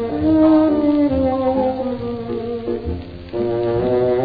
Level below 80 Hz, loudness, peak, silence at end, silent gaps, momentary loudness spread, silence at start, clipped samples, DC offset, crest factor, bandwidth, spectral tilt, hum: -38 dBFS; -18 LUFS; -4 dBFS; 0 s; none; 12 LU; 0 s; under 0.1%; under 0.1%; 14 dB; 5 kHz; -11 dB/octave; none